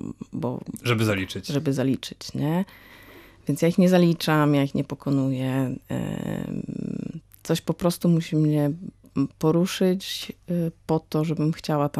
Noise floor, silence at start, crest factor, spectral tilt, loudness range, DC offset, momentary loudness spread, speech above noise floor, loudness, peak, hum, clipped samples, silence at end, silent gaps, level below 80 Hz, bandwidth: -48 dBFS; 0.05 s; 18 dB; -6.5 dB/octave; 4 LU; under 0.1%; 11 LU; 25 dB; -25 LUFS; -6 dBFS; none; under 0.1%; 0 s; none; -56 dBFS; 14.5 kHz